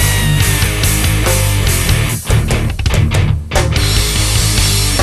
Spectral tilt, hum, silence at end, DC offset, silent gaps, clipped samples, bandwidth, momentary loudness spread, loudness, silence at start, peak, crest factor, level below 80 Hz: -3.5 dB/octave; none; 0 s; under 0.1%; none; under 0.1%; 13.5 kHz; 3 LU; -13 LUFS; 0 s; 0 dBFS; 12 dB; -18 dBFS